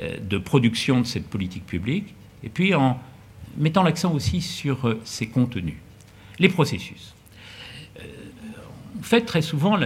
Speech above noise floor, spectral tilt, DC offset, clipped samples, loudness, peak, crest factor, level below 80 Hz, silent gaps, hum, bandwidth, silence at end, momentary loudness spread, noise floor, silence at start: 24 dB; -6 dB/octave; under 0.1%; under 0.1%; -23 LUFS; 0 dBFS; 24 dB; -52 dBFS; none; none; 16 kHz; 0 s; 21 LU; -46 dBFS; 0 s